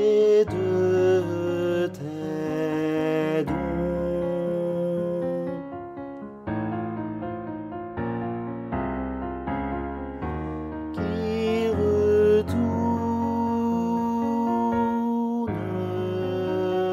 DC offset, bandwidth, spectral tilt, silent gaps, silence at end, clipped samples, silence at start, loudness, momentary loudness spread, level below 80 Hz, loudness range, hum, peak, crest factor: under 0.1%; 13.5 kHz; -8 dB/octave; none; 0 s; under 0.1%; 0 s; -26 LUFS; 12 LU; -46 dBFS; 8 LU; none; -12 dBFS; 14 dB